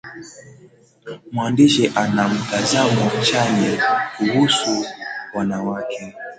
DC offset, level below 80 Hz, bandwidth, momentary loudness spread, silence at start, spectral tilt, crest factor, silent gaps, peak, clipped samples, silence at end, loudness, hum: under 0.1%; -56 dBFS; 9.4 kHz; 14 LU; 0.05 s; -4.5 dB/octave; 18 dB; none; -2 dBFS; under 0.1%; 0.05 s; -18 LUFS; none